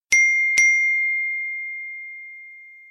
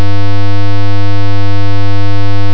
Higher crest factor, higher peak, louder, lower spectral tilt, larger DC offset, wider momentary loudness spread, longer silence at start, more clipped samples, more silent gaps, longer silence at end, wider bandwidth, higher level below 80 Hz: first, 20 dB vs 0 dB; about the same, -2 dBFS vs 0 dBFS; about the same, -17 LUFS vs -16 LUFS; second, 3.5 dB/octave vs -7.5 dB/octave; second, under 0.1% vs 80%; first, 21 LU vs 0 LU; about the same, 0.1 s vs 0 s; second, under 0.1% vs 50%; neither; first, 0.15 s vs 0 s; first, 13.5 kHz vs 5.4 kHz; second, -68 dBFS vs -48 dBFS